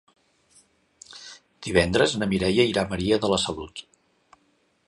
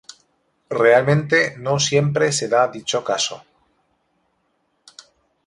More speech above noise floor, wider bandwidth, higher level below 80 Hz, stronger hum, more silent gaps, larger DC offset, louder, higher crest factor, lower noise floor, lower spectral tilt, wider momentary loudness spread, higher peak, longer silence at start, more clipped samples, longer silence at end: second, 44 dB vs 50 dB; about the same, 11.5 kHz vs 11.5 kHz; first, -46 dBFS vs -60 dBFS; neither; neither; neither; second, -23 LUFS vs -18 LUFS; about the same, 22 dB vs 20 dB; about the same, -67 dBFS vs -68 dBFS; about the same, -4.5 dB/octave vs -4 dB/octave; first, 21 LU vs 9 LU; about the same, -4 dBFS vs -2 dBFS; first, 1.1 s vs 0.7 s; neither; second, 1.05 s vs 2.1 s